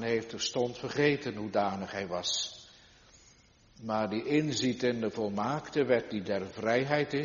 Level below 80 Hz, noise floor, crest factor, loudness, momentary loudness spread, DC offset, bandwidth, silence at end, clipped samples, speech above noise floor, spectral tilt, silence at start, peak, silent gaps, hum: -66 dBFS; -61 dBFS; 20 dB; -31 LUFS; 7 LU; under 0.1%; 7.2 kHz; 0 s; under 0.1%; 30 dB; -3.5 dB/octave; 0 s; -12 dBFS; none; none